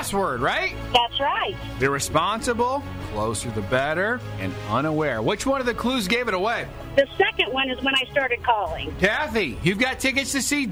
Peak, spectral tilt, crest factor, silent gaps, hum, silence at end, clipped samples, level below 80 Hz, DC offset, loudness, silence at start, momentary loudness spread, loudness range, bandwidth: -6 dBFS; -3.5 dB/octave; 18 dB; none; none; 0 s; under 0.1%; -42 dBFS; under 0.1%; -23 LUFS; 0 s; 6 LU; 2 LU; over 20 kHz